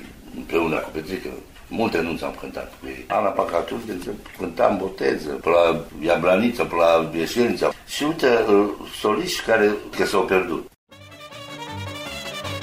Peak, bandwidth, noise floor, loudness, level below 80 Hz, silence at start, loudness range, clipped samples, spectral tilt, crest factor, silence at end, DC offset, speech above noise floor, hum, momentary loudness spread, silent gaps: -4 dBFS; 16 kHz; -41 dBFS; -22 LUFS; -48 dBFS; 0 s; 6 LU; under 0.1%; -4.5 dB/octave; 18 dB; 0 s; under 0.1%; 20 dB; none; 16 LU; 10.76-10.87 s